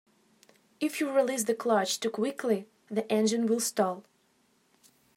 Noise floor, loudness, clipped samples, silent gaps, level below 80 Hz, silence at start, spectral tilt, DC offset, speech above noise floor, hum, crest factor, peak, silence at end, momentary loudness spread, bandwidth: -69 dBFS; -29 LUFS; under 0.1%; none; -86 dBFS; 0.8 s; -3.5 dB/octave; under 0.1%; 40 dB; none; 18 dB; -12 dBFS; 1.15 s; 7 LU; 16 kHz